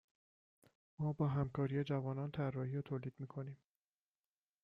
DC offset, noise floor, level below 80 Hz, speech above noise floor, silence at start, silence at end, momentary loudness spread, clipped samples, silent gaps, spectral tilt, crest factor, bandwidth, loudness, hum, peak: under 0.1%; under -90 dBFS; -70 dBFS; over 50 dB; 1 s; 1.1 s; 11 LU; under 0.1%; none; -10 dB/octave; 16 dB; 4.7 kHz; -41 LUFS; none; -26 dBFS